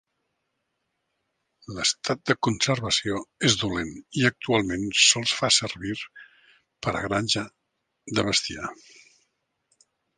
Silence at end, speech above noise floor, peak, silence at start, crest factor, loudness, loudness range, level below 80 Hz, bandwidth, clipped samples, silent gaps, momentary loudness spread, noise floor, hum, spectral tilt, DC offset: 1.45 s; 53 dB; -4 dBFS; 1.7 s; 24 dB; -24 LUFS; 6 LU; -54 dBFS; 10 kHz; under 0.1%; none; 14 LU; -78 dBFS; none; -2.5 dB/octave; under 0.1%